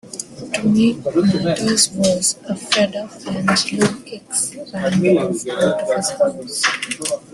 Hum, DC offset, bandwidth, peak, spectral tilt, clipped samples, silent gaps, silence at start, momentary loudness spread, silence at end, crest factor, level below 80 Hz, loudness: none; under 0.1%; 12.5 kHz; -2 dBFS; -3.5 dB/octave; under 0.1%; none; 0.05 s; 9 LU; 0.15 s; 18 dB; -54 dBFS; -18 LUFS